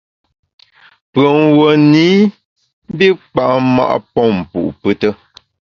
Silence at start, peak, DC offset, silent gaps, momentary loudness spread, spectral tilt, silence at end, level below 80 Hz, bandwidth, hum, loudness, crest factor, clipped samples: 1.15 s; 0 dBFS; under 0.1%; 2.45-2.56 s, 2.73-2.82 s; 10 LU; -7.5 dB/octave; 0.65 s; -48 dBFS; 7 kHz; none; -12 LUFS; 14 dB; under 0.1%